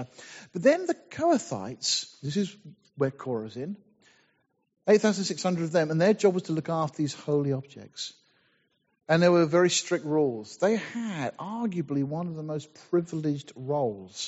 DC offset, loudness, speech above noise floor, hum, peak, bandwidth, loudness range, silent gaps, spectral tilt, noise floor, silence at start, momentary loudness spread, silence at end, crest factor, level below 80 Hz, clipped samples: under 0.1%; -27 LUFS; 45 dB; none; -8 dBFS; 8 kHz; 5 LU; none; -5 dB/octave; -72 dBFS; 0 s; 14 LU; 0 s; 20 dB; -72 dBFS; under 0.1%